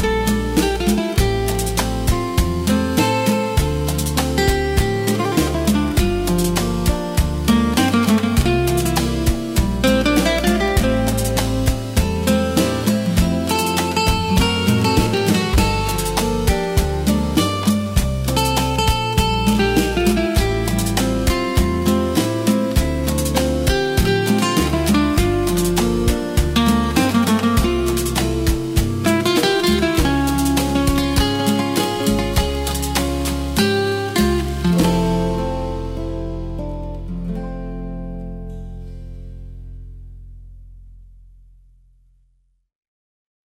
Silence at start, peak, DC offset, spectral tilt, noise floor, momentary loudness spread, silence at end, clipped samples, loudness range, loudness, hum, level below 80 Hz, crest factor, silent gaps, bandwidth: 0 s; -4 dBFS; under 0.1%; -5 dB/octave; -61 dBFS; 10 LU; 2.55 s; under 0.1%; 5 LU; -18 LUFS; none; -26 dBFS; 14 dB; none; 16.5 kHz